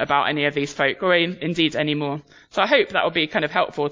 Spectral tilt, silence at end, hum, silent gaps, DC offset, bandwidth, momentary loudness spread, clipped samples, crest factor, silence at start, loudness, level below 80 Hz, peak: -5 dB/octave; 0 s; none; none; under 0.1%; 7.6 kHz; 6 LU; under 0.1%; 18 dB; 0 s; -21 LUFS; -60 dBFS; -2 dBFS